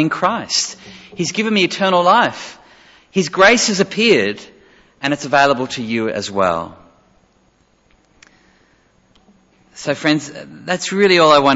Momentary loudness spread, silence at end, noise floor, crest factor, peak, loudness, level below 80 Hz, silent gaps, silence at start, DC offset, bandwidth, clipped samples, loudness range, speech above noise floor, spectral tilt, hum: 18 LU; 0 s; -57 dBFS; 18 dB; 0 dBFS; -15 LUFS; -56 dBFS; none; 0 s; under 0.1%; 8 kHz; under 0.1%; 11 LU; 41 dB; -3.5 dB/octave; none